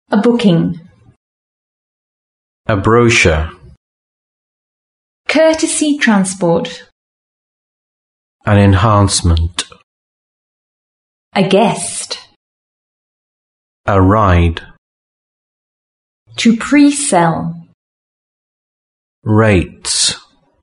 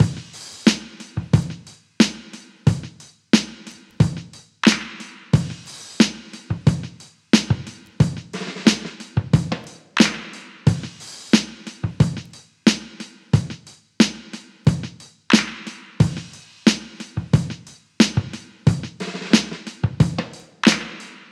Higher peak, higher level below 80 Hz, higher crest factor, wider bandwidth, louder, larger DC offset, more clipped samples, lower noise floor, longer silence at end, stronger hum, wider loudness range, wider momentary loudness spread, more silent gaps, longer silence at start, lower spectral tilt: about the same, 0 dBFS vs 0 dBFS; first, -32 dBFS vs -44 dBFS; second, 16 dB vs 22 dB; second, 11 kHz vs 12.5 kHz; first, -12 LUFS vs -21 LUFS; neither; neither; first, under -90 dBFS vs -42 dBFS; first, 0.45 s vs 0.15 s; neither; about the same, 3 LU vs 2 LU; about the same, 16 LU vs 18 LU; first, 1.16-2.64 s, 3.77-5.24 s, 6.92-8.39 s, 9.83-11.31 s, 12.36-13.84 s, 14.78-16.26 s, 17.74-19.22 s vs none; about the same, 0.1 s vs 0 s; about the same, -5 dB/octave vs -5 dB/octave